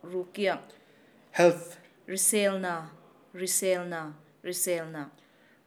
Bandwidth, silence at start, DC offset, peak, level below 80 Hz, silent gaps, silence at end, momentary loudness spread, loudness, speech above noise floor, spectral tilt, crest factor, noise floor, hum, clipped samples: over 20 kHz; 0.05 s; under 0.1%; -8 dBFS; under -90 dBFS; none; 0.55 s; 21 LU; -28 LUFS; 30 dB; -3 dB/octave; 22 dB; -59 dBFS; none; under 0.1%